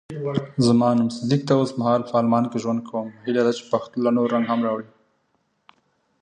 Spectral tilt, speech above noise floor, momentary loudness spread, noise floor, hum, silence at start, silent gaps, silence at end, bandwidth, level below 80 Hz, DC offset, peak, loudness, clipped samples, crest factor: -7 dB/octave; 48 dB; 8 LU; -69 dBFS; none; 0.1 s; none; 1.35 s; 10 kHz; -62 dBFS; under 0.1%; -4 dBFS; -22 LUFS; under 0.1%; 18 dB